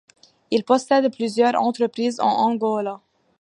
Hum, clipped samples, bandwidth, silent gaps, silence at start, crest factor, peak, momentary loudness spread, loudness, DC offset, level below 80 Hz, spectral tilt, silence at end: none; under 0.1%; 11.5 kHz; none; 0.5 s; 18 dB; -4 dBFS; 7 LU; -21 LUFS; under 0.1%; -72 dBFS; -5 dB/octave; 0.45 s